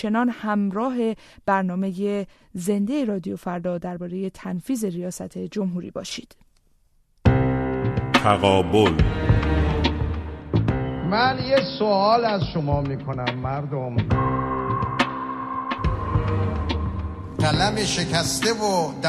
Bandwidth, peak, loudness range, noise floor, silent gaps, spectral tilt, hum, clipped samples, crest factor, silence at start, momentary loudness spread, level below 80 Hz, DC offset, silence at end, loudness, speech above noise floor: 13.5 kHz; -4 dBFS; 7 LU; -60 dBFS; none; -5.5 dB/octave; none; under 0.1%; 18 dB; 0 s; 11 LU; -34 dBFS; under 0.1%; 0 s; -23 LUFS; 38 dB